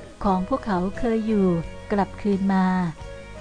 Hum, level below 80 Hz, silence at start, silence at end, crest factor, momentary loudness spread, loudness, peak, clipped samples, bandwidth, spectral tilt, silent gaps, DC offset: none; -40 dBFS; 0 s; 0 s; 14 dB; 7 LU; -24 LUFS; -10 dBFS; under 0.1%; 9.8 kHz; -8 dB/octave; none; under 0.1%